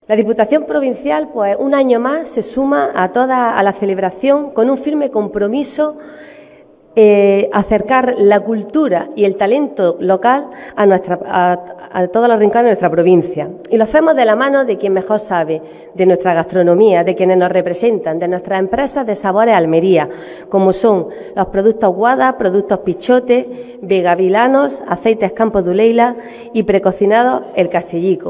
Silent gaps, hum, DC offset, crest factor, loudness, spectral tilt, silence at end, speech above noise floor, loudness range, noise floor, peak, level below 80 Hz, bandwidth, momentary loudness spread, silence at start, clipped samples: none; none; under 0.1%; 12 dB; -13 LUFS; -10.5 dB/octave; 0 s; 30 dB; 2 LU; -43 dBFS; 0 dBFS; -48 dBFS; 4 kHz; 7 LU; 0.1 s; under 0.1%